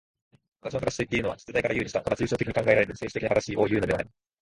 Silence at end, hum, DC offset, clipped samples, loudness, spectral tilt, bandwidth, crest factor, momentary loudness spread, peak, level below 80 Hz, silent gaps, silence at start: 0.35 s; none; under 0.1%; under 0.1%; -27 LUFS; -5.5 dB/octave; 11.5 kHz; 22 dB; 8 LU; -6 dBFS; -50 dBFS; none; 0.65 s